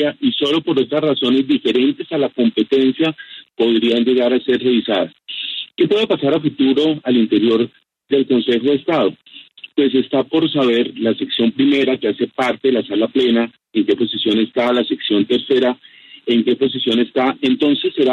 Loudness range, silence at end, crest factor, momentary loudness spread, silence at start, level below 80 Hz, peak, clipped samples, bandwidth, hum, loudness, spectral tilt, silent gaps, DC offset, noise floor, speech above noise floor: 1 LU; 0 s; 12 dB; 5 LU; 0 s; -62 dBFS; -4 dBFS; under 0.1%; 8 kHz; none; -17 LUFS; -6.5 dB/octave; none; under 0.1%; -40 dBFS; 24 dB